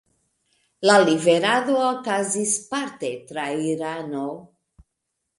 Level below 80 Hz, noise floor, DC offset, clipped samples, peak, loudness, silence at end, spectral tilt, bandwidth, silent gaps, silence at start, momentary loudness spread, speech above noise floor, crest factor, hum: -66 dBFS; -79 dBFS; under 0.1%; under 0.1%; -4 dBFS; -22 LUFS; 0.95 s; -3.5 dB/octave; 11.5 kHz; none; 0.8 s; 13 LU; 58 dB; 20 dB; none